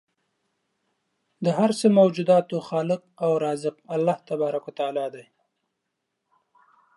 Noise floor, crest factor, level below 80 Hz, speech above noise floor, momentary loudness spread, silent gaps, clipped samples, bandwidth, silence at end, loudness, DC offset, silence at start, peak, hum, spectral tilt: -80 dBFS; 18 dB; -78 dBFS; 57 dB; 10 LU; none; under 0.1%; 11.5 kHz; 1.75 s; -24 LUFS; under 0.1%; 1.4 s; -6 dBFS; none; -6.5 dB/octave